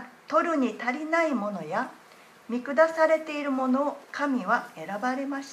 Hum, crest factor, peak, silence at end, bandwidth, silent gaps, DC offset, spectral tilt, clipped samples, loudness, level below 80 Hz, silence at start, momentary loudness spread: none; 20 dB; -8 dBFS; 0 s; 13.5 kHz; none; under 0.1%; -5 dB/octave; under 0.1%; -27 LUFS; -84 dBFS; 0 s; 8 LU